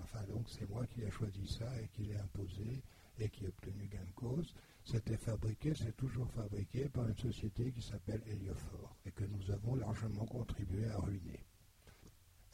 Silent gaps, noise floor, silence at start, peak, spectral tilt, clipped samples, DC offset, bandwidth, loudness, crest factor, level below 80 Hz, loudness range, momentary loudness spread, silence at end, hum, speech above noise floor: none; -64 dBFS; 0 s; -26 dBFS; -7 dB/octave; under 0.1%; under 0.1%; 16 kHz; -43 LUFS; 16 dB; -54 dBFS; 4 LU; 9 LU; 0.05 s; none; 22 dB